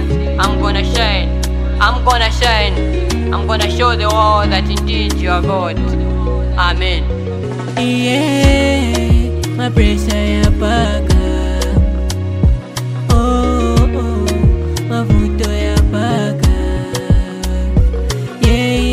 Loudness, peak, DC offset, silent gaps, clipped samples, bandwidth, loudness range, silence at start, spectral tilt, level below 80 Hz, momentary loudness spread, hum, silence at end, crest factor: -14 LUFS; 0 dBFS; under 0.1%; none; under 0.1%; 14.5 kHz; 2 LU; 0 s; -5.5 dB/octave; -16 dBFS; 6 LU; none; 0 s; 12 dB